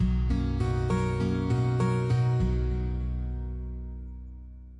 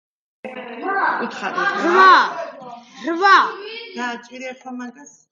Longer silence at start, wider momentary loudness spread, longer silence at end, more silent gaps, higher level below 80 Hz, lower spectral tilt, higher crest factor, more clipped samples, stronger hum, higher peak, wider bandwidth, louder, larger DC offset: second, 0 s vs 0.45 s; second, 16 LU vs 22 LU; second, 0 s vs 0.25 s; neither; first, -32 dBFS vs -76 dBFS; first, -8.5 dB/octave vs -3 dB/octave; second, 12 dB vs 18 dB; neither; neither; second, -16 dBFS vs 0 dBFS; first, 10.5 kHz vs 7.6 kHz; second, -28 LUFS vs -16 LUFS; neither